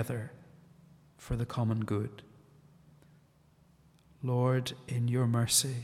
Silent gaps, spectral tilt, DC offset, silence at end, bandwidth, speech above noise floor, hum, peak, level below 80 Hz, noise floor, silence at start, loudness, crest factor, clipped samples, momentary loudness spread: none; -4.5 dB/octave; under 0.1%; 0 s; 16 kHz; 33 dB; none; -12 dBFS; -56 dBFS; -64 dBFS; 0 s; -32 LUFS; 22 dB; under 0.1%; 15 LU